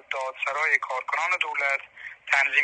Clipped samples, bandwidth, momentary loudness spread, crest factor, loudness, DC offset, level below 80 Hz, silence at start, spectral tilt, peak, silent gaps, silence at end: under 0.1%; 11 kHz; 9 LU; 20 dB; -24 LUFS; under 0.1%; -76 dBFS; 0.1 s; 1.5 dB/octave; -6 dBFS; none; 0 s